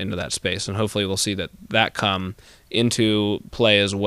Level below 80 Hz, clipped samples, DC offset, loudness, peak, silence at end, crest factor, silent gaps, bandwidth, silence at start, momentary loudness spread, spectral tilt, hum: -50 dBFS; under 0.1%; under 0.1%; -21 LUFS; -2 dBFS; 0 s; 20 dB; none; 15.5 kHz; 0 s; 9 LU; -4 dB/octave; none